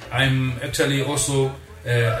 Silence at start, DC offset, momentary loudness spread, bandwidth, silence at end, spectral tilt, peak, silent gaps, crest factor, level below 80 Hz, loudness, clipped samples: 0 s; under 0.1%; 5 LU; 15.5 kHz; 0 s; -4.5 dB/octave; -6 dBFS; none; 16 dB; -44 dBFS; -21 LUFS; under 0.1%